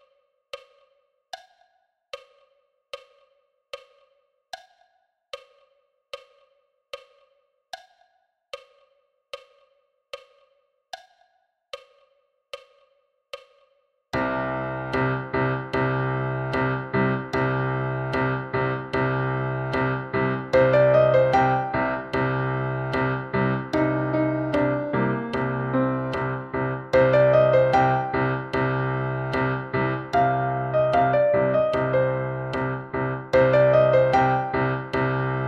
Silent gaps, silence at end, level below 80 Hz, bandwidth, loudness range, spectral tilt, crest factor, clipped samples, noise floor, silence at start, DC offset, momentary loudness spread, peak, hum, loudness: none; 0 s; -50 dBFS; 7.2 kHz; 6 LU; -8 dB/octave; 18 dB; under 0.1%; -68 dBFS; 0.55 s; under 0.1%; 25 LU; -6 dBFS; none; -23 LUFS